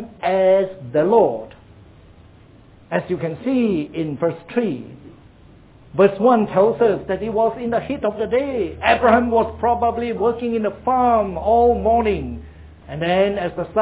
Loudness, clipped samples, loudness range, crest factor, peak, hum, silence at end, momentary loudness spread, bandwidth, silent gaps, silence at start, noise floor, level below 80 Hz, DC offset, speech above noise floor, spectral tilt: -19 LUFS; under 0.1%; 6 LU; 18 dB; -2 dBFS; none; 0 s; 10 LU; 4 kHz; none; 0 s; -47 dBFS; -42 dBFS; under 0.1%; 29 dB; -10.5 dB/octave